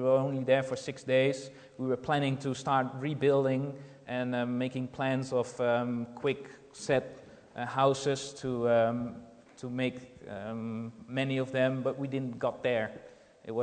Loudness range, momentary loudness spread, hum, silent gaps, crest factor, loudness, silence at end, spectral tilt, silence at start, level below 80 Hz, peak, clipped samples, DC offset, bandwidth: 3 LU; 14 LU; none; none; 18 dB; -31 LUFS; 0 s; -6 dB/octave; 0 s; -68 dBFS; -12 dBFS; under 0.1%; under 0.1%; 9.4 kHz